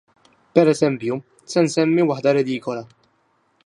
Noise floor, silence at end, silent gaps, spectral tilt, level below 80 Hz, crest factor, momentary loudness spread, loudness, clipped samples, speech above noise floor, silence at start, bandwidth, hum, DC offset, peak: -64 dBFS; 0.8 s; none; -6 dB/octave; -68 dBFS; 20 dB; 11 LU; -20 LUFS; under 0.1%; 45 dB; 0.55 s; 11.5 kHz; none; under 0.1%; 0 dBFS